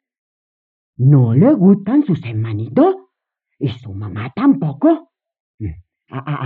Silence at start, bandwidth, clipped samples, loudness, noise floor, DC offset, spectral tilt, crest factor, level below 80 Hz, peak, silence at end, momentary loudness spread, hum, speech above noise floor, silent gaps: 1 s; 4.4 kHz; under 0.1%; -15 LUFS; -76 dBFS; under 0.1%; -12 dB/octave; 16 dB; -52 dBFS; -2 dBFS; 0 s; 18 LU; none; 62 dB; 5.40-5.58 s